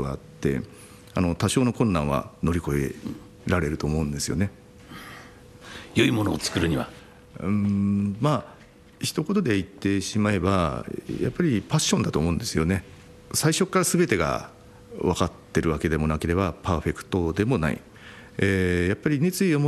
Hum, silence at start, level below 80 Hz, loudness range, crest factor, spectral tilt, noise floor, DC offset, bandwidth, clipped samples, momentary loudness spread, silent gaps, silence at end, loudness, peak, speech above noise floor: none; 0 s; -44 dBFS; 3 LU; 18 dB; -5.5 dB/octave; -46 dBFS; under 0.1%; 13 kHz; under 0.1%; 14 LU; none; 0 s; -25 LUFS; -6 dBFS; 22 dB